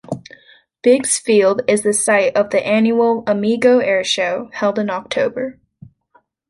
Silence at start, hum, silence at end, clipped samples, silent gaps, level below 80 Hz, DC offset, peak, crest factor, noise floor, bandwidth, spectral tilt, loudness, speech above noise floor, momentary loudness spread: 0.1 s; none; 0.95 s; under 0.1%; none; -60 dBFS; under 0.1%; -2 dBFS; 16 dB; -58 dBFS; 11.5 kHz; -3.5 dB/octave; -16 LUFS; 42 dB; 8 LU